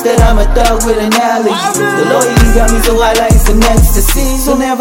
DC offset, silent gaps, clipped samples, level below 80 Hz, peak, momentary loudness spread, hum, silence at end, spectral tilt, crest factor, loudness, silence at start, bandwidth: under 0.1%; none; 0.3%; -12 dBFS; 0 dBFS; 3 LU; none; 0 s; -4.5 dB/octave; 8 dB; -10 LUFS; 0 s; 17.5 kHz